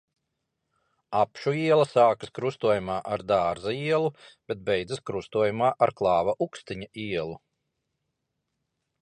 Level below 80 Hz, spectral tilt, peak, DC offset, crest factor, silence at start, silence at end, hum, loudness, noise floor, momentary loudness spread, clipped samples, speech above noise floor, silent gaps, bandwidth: -60 dBFS; -6 dB/octave; -8 dBFS; under 0.1%; 20 dB; 1.1 s; 1.65 s; none; -26 LUFS; -81 dBFS; 11 LU; under 0.1%; 55 dB; none; 10.5 kHz